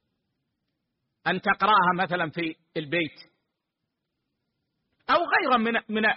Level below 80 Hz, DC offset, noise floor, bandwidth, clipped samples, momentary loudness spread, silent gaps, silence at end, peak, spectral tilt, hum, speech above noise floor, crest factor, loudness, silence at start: -66 dBFS; under 0.1%; -82 dBFS; 5.6 kHz; under 0.1%; 12 LU; none; 0 s; -10 dBFS; -2 dB/octave; none; 58 dB; 18 dB; -24 LUFS; 1.25 s